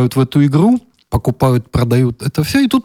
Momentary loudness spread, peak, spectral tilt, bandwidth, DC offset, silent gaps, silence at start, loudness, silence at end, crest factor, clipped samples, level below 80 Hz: 7 LU; -2 dBFS; -7 dB/octave; 16.5 kHz; under 0.1%; none; 0 s; -14 LUFS; 0.05 s; 12 dB; under 0.1%; -34 dBFS